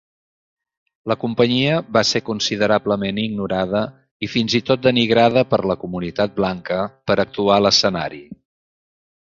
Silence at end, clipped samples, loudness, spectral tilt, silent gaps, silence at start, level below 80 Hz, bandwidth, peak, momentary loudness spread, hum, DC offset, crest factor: 0.85 s; under 0.1%; -18 LUFS; -4.5 dB/octave; 4.11-4.20 s; 1.05 s; -50 dBFS; 7.8 kHz; 0 dBFS; 10 LU; none; under 0.1%; 18 dB